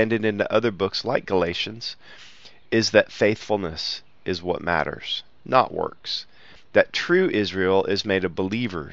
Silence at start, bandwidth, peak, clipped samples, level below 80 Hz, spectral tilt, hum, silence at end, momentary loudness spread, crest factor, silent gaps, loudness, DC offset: 0 s; 7.8 kHz; -2 dBFS; under 0.1%; -54 dBFS; -5 dB/octave; none; 0 s; 10 LU; 22 dB; none; -23 LUFS; 0.5%